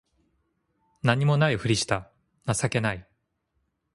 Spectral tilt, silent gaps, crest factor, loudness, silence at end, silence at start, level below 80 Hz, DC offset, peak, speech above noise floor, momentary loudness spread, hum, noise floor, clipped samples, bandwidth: -5 dB/octave; none; 24 dB; -25 LUFS; 0.9 s; 1.05 s; -54 dBFS; under 0.1%; -4 dBFS; 51 dB; 8 LU; none; -75 dBFS; under 0.1%; 11.5 kHz